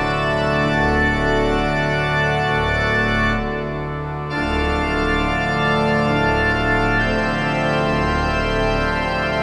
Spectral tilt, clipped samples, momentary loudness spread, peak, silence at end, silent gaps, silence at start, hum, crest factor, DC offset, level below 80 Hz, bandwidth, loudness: -6 dB/octave; under 0.1%; 4 LU; -6 dBFS; 0 s; none; 0 s; none; 14 dB; under 0.1%; -28 dBFS; 11 kHz; -19 LUFS